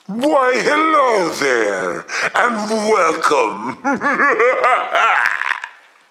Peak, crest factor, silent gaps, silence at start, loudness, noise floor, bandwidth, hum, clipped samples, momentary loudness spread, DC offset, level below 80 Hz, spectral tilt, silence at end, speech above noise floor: 0 dBFS; 16 dB; none; 0.1 s; -15 LUFS; -36 dBFS; 15 kHz; none; under 0.1%; 8 LU; under 0.1%; -66 dBFS; -3 dB/octave; 0.4 s; 20 dB